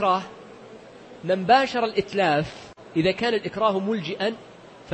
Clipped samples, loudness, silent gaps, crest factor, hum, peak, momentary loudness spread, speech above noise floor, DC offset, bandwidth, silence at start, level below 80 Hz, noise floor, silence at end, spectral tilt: under 0.1%; -23 LUFS; none; 20 dB; none; -4 dBFS; 23 LU; 22 dB; under 0.1%; 8.8 kHz; 0 s; -58 dBFS; -44 dBFS; 0 s; -5.5 dB/octave